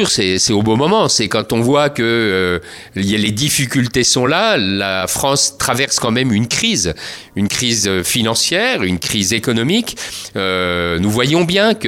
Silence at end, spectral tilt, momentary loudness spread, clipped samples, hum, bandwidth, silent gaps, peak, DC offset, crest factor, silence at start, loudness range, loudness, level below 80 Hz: 0 s; -3.5 dB/octave; 6 LU; under 0.1%; none; 16.5 kHz; none; 0 dBFS; under 0.1%; 16 dB; 0 s; 1 LU; -14 LUFS; -42 dBFS